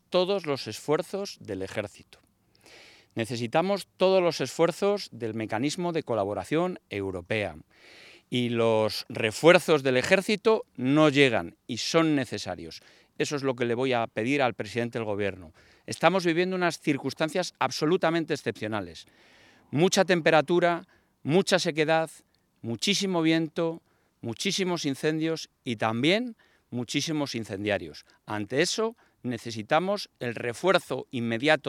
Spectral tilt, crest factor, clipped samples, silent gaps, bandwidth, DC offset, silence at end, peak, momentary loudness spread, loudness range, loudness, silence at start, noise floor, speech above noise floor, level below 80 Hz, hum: -4.5 dB/octave; 24 dB; under 0.1%; none; 16 kHz; under 0.1%; 0 s; -4 dBFS; 13 LU; 6 LU; -27 LUFS; 0.1 s; -58 dBFS; 32 dB; -72 dBFS; none